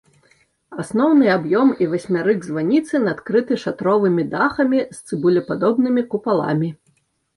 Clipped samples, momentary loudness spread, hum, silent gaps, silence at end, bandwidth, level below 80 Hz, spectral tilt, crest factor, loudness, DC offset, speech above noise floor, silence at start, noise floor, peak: under 0.1%; 7 LU; none; none; 0.6 s; 11.5 kHz; -60 dBFS; -7 dB/octave; 14 dB; -19 LUFS; under 0.1%; 45 dB; 0.7 s; -63 dBFS; -4 dBFS